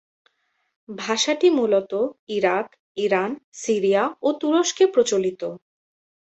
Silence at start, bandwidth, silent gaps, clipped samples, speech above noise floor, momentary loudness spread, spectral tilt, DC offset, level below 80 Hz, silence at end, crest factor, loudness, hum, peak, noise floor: 0.9 s; 8.2 kHz; 2.19-2.27 s, 2.79-2.95 s, 3.44-3.52 s; under 0.1%; 45 dB; 13 LU; -3.5 dB/octave; under 0.1%; -70 dBFS; 0.7 s; 16 dB; -21 LUFS; none; -6 dBFS; -67 dBFS